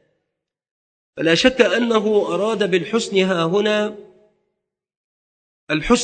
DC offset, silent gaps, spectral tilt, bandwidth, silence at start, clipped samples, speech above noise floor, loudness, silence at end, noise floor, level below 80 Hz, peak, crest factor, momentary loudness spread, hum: under 0.1%; 4.97-5.67 s; -4.5 dB/octave; 9.2 kHz; 1.2 s; under 0.1%; 62 dB; -18 LUFS; 0 s; -79 dBFS; -46 dBFS; 0 dBFS; 20 dB; 8 LU; none